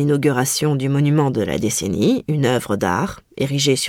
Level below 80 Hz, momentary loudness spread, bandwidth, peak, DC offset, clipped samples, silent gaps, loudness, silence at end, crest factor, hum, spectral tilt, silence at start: -48 dBFS; 5 LU; 17 kHz; -4 dBFS; under 0.1%; under 0.1%; none; -19 LUFS; 0 s; 14 dB; none; -5 dB/octave; 0 s